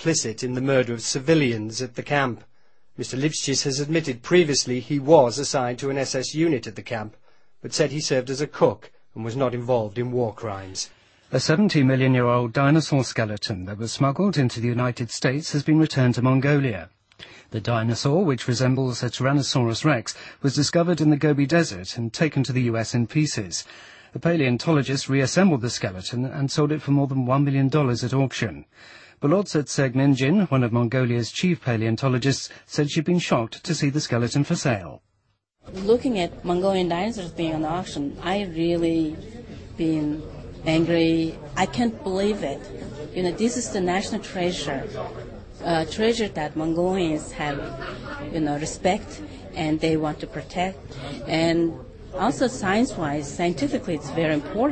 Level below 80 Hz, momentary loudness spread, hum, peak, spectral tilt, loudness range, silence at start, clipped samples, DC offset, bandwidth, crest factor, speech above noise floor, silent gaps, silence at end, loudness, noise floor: -50 dBFS; 12 LU; none; -2 dBFS; -5.5 dB/octave; 4 LU; 0 s; under 0.1%; under 0.1%; 8.8 kHz; 20 dB; 47 dB; none; 0 s; -23 LUFS; -70 dBFS